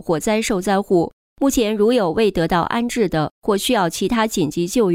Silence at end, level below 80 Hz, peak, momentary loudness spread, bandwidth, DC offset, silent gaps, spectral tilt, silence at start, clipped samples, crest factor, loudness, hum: 0 s; -42 dBFS; -6 dBFS; 4 LU; 16 kHz; under 0.1%; 1.13-1.36 s, 3.31-3.42 s; -5 dB/octave; 0.05 s; under 0.1%; 12 dB; -19 LUFS; none